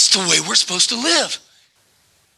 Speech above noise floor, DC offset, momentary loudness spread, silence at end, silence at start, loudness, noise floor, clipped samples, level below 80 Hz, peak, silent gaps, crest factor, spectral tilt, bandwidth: 41 dB; under 0.1%; 9 LU; 1 s; 0 s; -15 LUFS; -58 dBFS; under 0.1%; -76 dBFS; 0 dBFS; none; 18 dB; -0.5 dB/octave; 13.5 kHz